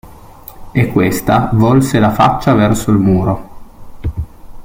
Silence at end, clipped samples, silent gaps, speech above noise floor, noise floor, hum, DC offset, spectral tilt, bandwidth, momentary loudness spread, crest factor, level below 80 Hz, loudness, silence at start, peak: 0 s; under 0.1%; none; 24 dB; -35 dBFS; none; under 0.1%; -7 dB/octave; 17 kHz; 13 LU; 14 dB; -32 dBFS; -13 LUFS; 0.05 s; 0 dBFS